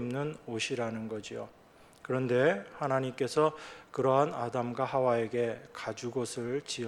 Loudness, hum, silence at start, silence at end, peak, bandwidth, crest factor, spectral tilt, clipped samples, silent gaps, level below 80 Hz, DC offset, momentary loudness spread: -32 LUFS; none; 0 s; 0 s; -12 dBFS; 13 kHz; 20 dB; -5.5 dB/octave; under 0.1%; none; -70 dBFS; under 0.1%; 12 LU